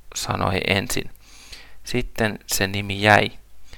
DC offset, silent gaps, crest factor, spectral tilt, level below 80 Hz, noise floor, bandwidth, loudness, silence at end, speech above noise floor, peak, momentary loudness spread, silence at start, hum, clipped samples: under 0.1%; none; 24 dB; -3.5 dB/octave; -40 dBFS; -42 dBFS; 19 kHz; -21 LUFS; 0 s; 21 dB; 0 dBFS; 22 LU; 0.05 s; none; under 0.1%